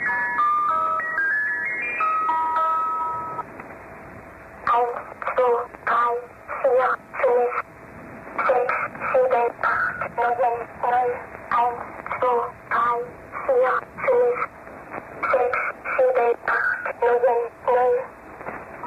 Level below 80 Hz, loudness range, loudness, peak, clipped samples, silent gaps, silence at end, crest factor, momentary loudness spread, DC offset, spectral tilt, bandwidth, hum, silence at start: -58 dBFS; 3 LU; -22 LUFS; -10 dBFS; under 0.1%; none; 0 s; 14 dB; 16 LU; under 0.1%; -5.5 dB/octave; 8 kHz; none; 0 s